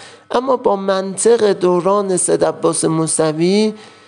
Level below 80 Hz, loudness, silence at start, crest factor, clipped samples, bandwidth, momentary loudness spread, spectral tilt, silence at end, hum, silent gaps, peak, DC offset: -60 dBFS; -15 LUFS; 0 s; 14 dB; under 0.1%; 11.5 kHz; 5 LU; -4.5 dB/octave; 0.2 s; none; none; -2 dBFS; under 0.1%